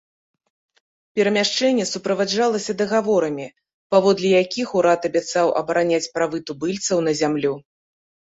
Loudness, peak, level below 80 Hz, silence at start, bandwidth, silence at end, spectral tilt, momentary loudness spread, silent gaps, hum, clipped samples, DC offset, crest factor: -20 LUFS; -4 dBFS; -64 dBFS; 1.15 s; 8 kHz; 0.7 s; -4 dB/octave; 8 LU; 3.74-3.90 s; none; under 0.1%; under 0.1%; 18 dB